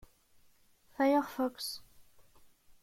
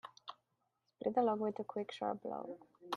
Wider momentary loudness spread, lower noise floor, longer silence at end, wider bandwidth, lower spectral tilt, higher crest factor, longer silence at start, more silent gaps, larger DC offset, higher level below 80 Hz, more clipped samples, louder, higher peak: about the same, 17 LU vs 19 LU; second, -65 dBFS vs -83 dBFS; first, 0.8 s vs 0 s; first, 16.5 kHz vs 11.5 kHz; second, -3 dB/octave vs -6 dB/octave; about the same, 20 dB vs 20 dB; first, 1 s vs 0.05 s; neither; neither; first, -70 dBFS vs -84 dBFS; neither; first, -33 LUFS vs -39 LUFS; about the same, -18 dBFS vs -20 dBFS